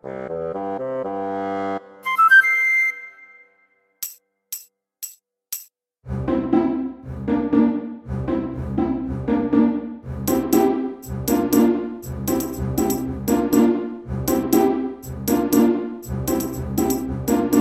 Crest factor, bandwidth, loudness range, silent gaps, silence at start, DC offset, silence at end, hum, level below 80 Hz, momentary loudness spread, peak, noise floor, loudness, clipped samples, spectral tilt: 18 dB; 16.5 kHz; 8 LU; none; 0.05 s; under 0.1%; 0 s; none; -40 dBFS; 15 LU; -4 dBFS; -62 dBFS; -21 LUFS; under 0.1%; -5.5 dB/octave